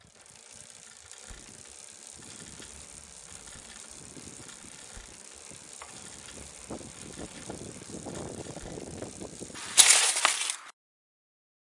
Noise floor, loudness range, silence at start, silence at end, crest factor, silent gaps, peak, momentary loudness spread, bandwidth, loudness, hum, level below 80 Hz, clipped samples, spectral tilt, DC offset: -54 dBFS; 20 LU; 0.15 s; 0.9 s; 32 dB; none; 0 dBFS; 22 LU; 11.5 kHz; -23 LUFS; none; -60 dBFS; under 0.1%; 0 dB/octave; under 0.1%